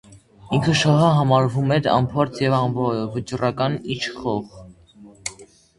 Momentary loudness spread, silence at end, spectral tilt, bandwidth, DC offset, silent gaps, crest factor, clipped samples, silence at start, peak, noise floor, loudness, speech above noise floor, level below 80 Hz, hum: 14 LU; 0.35 s; -6 dB/octave; 11.5 kHz; under 0.1%; none; 18 dB; under 0.1%; 0.1 s; -2 dBFS; -47 dBFS; -20 LUFS; 27 dB; -50 dBFS; none